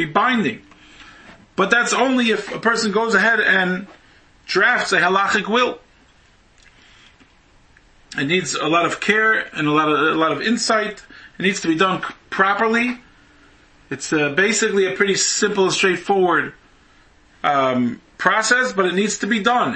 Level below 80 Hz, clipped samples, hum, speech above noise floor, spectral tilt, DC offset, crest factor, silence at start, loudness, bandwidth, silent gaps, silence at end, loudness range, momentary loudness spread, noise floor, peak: -58 dBFS; under 0.1%; none; 35 dB; -3 dB/octave; under 0.1%; 20 dB; 0 s; -18 LUFS; 8.8 kHz; none; 0 s; 4 LU; 9 LU; -53 dBFS; 0 dBFS